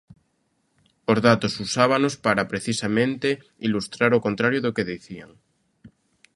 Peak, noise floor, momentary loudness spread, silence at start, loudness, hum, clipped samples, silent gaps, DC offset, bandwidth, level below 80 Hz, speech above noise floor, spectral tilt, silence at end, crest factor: -2 dBFS; -70 dBFS; 10 LU; 1.1 s; -22 LUFS; none; under 0.1%; none; under 0.1%; 11.5 kHz; -58 dBFS; 48 dB; -5 dB/octave; 1.1 s; 22 dB